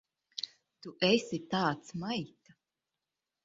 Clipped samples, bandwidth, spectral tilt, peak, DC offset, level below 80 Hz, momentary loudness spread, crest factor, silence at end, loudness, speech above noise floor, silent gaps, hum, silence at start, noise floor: under 0.1%; 7.6 kHz; -3.5 dB/octave; -14 dBFS; under 0.1%; -74 dBFS; 19 LU; 22 dB; 1.2 s; -33 LUFS; 57 dB; none; none; 0.35 s; -89 dBFS